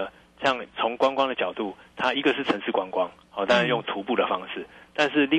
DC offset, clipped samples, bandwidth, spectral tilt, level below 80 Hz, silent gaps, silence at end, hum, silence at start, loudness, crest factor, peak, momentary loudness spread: under 0.1%; under 0.1%; 10.5 kHz; -5 dB/octave; -64 dBFS; none; 0 s; none; 0 s; -25 LUFS; 16 dB; -8 dBFS; 11 LU